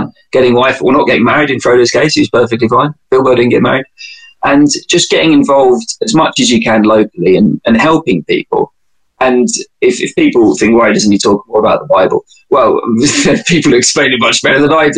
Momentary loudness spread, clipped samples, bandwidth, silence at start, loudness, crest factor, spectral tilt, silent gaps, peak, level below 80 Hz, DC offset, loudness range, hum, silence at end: 5 LU; under 0.1%; 10 kHz; 0 s; -9 LUFS; 10 dB; -4 dB/octave; none; 0 dBFS; -44 dBFS; under 0.1%; 2 LU; none; 0 s